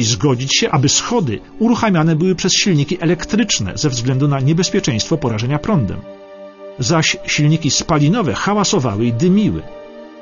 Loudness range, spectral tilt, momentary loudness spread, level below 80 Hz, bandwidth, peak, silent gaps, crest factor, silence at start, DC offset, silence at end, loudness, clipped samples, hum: 3 LU; -4.5 dB/octave; 10 LU; -42 dBFS; 7.4 kHz; -2 dBFS; none; 14 dB; 0 s; under 0.1%; 0 s; -15 LUFS; under 0.1%; none